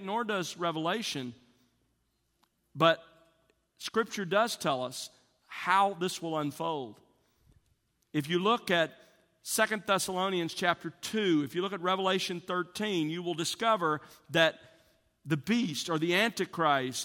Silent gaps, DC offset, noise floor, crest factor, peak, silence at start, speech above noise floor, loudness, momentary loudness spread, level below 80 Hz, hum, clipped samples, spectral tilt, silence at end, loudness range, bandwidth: none; under 0.1%; -76 dBFS; 22 dB; -10 dBFS; 0 s; 46 dB; -30 LUFS; 10 LU; -74 dBFS; none; under 0.1%; -4 dB/octave; 0 s; 3 LU; 18 kHz